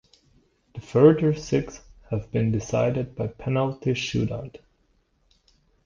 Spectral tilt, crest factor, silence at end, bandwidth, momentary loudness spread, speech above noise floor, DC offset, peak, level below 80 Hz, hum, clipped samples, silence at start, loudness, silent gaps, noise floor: -7 dB/octave; 22 dB; 1.3 s; 7.4 kHz; 18 LU; 43 dB; under 0.1%; -4 dBFS; -50 dBFS; none; under 0.1%; 0.75 s; -24 LUFS; none; -66 dBFS